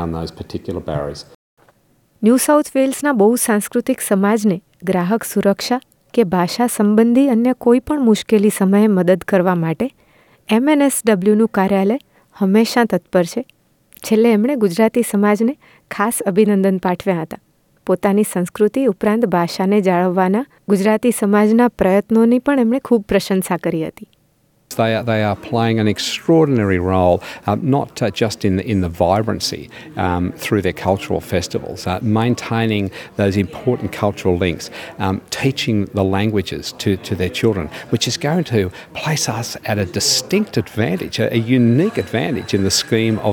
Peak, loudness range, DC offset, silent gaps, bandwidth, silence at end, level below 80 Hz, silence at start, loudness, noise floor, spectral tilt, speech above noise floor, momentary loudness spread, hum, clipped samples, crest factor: -2 dBFS; 4 LU; under 0.1%; 1.35-1.57 s; 18.5 kHz; 0 s; -50 dBFS; 0 s; -17 LUFS; -58 dBFS; -5.5 dB/octave; 42 dB; 9 LU; none; under 0.1%; 16 dB